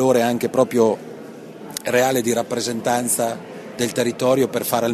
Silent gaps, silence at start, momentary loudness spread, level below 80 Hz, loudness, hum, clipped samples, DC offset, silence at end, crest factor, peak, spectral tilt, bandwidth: none; 0 s; 16 LU; -62 dBFS; -20 LUFS; none; under 0.1%; under 0.1%; 0 s; 18 dB; -2 dBFS; -4 dB/octave; 14 kHz